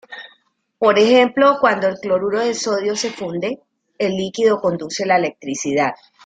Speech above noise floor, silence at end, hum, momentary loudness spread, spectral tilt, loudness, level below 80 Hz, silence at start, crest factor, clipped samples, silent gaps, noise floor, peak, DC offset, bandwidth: 42 dB; 0.3 s; none; 12 LU; -4 dB/octave; -18 LUFS; -62 dBFS; 0.1 s; 18 dB; under 0.1%; none; -59 dBFS; -2 dBFS; under 0.1%; 9.4 kHz